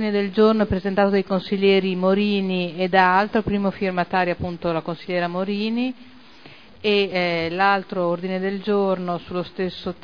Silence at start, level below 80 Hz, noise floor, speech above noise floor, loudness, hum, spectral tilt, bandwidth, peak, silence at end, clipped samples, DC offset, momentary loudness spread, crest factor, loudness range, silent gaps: 0 s; -50 dBFS; -46 dBFS; 25 dB; -21 LUFS; none; -8 dB/octave; 5.2 kHz; -2 dBFS; 0.1 s; under 0.1%; 0.4%; 9 LU; 18 dB; 5 LU; none